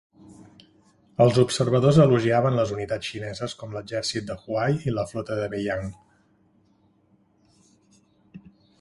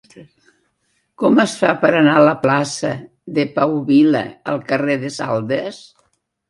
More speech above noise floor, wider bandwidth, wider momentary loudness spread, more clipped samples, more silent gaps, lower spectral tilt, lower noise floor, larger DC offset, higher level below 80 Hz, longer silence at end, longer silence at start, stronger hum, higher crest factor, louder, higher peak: second, 40 dB vs 50 dB; about the same, 11.5 kHz vs 11.5 kHz; first, 14 LU vs 11 LU; neither; neither; about the same, -6.5 dB/octave vs -5.5 dB/octave; second, -63 dBFS vs -67 dBFS; neither; first, -54 dBFS vs -62 dBFS; second, 0.45 s vs 0.7 s; first, 0.3 s vs 0.15 s; neither; about the same, 20 dB vs 18 dB; second, -23 LUFS vs -16 LUFS; second, -4 dBFS vs 0 dBFS